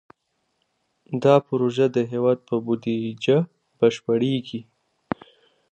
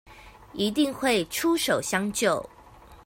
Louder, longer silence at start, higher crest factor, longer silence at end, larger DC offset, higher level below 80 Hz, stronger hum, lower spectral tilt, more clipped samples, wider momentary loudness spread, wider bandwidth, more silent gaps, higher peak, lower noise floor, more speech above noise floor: about the same, -23 LUFS vs -25 LUFS; first, 1.1 s vs 0.1 s; about the same, 22 dB vs 18 dB; first, 1.1 s vs 0.1 s; neither; second, -66 dBFS vs -56 dBFS; neither; first, -7 dB/octave vs -3.5 dB/octave; neither; first, 15 LU vs 7 LU; second, 8.8 kHz vs 16.5 kHz; neither; first, -2 dBFS vs -8 dBFS; first, -73 dBFS vs -50 dBFS; first, 52 dB vs 25 dB